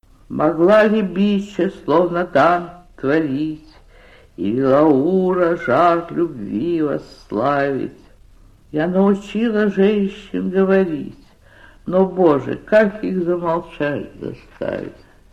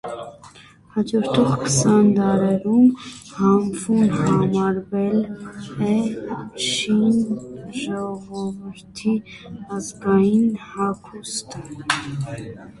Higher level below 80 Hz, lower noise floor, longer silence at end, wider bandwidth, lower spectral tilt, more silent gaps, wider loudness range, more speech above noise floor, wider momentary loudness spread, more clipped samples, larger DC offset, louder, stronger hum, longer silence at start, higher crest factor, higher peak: about the same, -48 dBFS vs -52 dBFS; about the same, -47 dBFS vs -47 dBFS; first, 0.4 s vs 0.1 s; second, 8.4 kHz vs 11.5 kHz; first, -8 dB/octave vs -5.5 dB/octave; neither; second, 3 LU vs 6 LU; first, 30 dB vs 26 dB; second, 13 LU vs 17 LU; neither; neither; first, -18 LUFS vs -21 LUFS; neither; first, 0.3 s vs 0.05 s; about the same, 16 dB vs 18 dB; about the same, -2 dBFS vs -2 dBFS